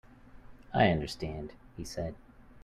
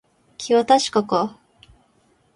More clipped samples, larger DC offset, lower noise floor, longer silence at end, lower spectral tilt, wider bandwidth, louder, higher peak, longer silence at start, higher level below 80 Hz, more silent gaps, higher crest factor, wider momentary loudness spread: neither; neither; second, -52 dBFS vs -61 dBFS; second, 0.05 s vs 1.05 s; first, -6 dB/octave vs -4 dB/octave; first, 14 kHz vs 11.5 kHz; second, -32 LUFS vs -19 LUFS; second, -12 dBFS vs -2 dBFS; second, 0.1 s vs 0.4 s; first, -52 dBFS vs -62 dBFS; neither; about the same, 22 dB vs 20 dB; first, 19 LU vs 12 LU